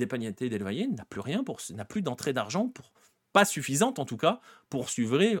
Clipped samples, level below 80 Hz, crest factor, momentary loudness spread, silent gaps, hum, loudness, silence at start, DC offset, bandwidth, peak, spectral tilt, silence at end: under 0.1%; -72 dBFS; 24 dB; 11 LU; none; none; -30 LUFS; 0 s; under 0.1%; 18 kHz; -6 dBFS; -4.5 dB/octave; 0 s